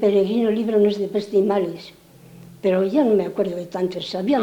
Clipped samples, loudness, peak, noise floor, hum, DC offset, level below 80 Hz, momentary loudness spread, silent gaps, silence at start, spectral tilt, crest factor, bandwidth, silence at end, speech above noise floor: under 0.1%; -21 LUFS; -8 dBFS; -45 dBFS; none; under 0.1%; -60 dBFS; 7 LU; none; 0 s; -7 dB/octave; 14 dB; 17.5 kHz; 0 s; 25 dB